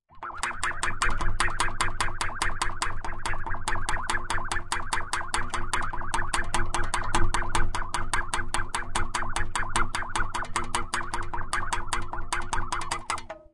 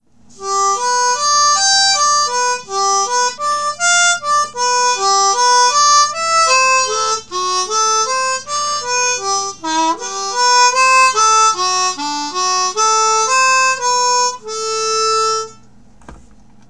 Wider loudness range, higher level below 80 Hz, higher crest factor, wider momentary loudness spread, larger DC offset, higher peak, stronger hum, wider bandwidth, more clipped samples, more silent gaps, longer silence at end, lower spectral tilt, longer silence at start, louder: about the same, 1 LU vs 3 LU; first, -32 dBFS vs -56 dBFS; about the same, 18 dB vs 14 dB; second, 5 LU vs 8 LU; second, under 0.1% vs 0.7%; second, -8 dBFS vs 0 dBFS; neither; about the same, 11.5 kHz vs 11 kHz; neither; neither; second, 0.15 s vs 0.55 s; first, -2.5 dB/octave vs 1 dB/octave; second, 0.15 s vs 0.4 s; second, -30 LUFS vs -13 LUFS